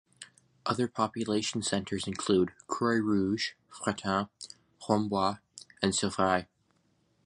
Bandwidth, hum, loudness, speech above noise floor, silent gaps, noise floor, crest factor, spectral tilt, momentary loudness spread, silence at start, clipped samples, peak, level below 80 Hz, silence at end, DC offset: 11 kHz; none; -31 LUFS; 41 dB; none; -71 dBFS; 22 dB; -4.5 dB/octave; 18 LU; 0.2 s; under 0.1%; -8 dBFS; -60 dBFS; 0.8 s; under 0.1%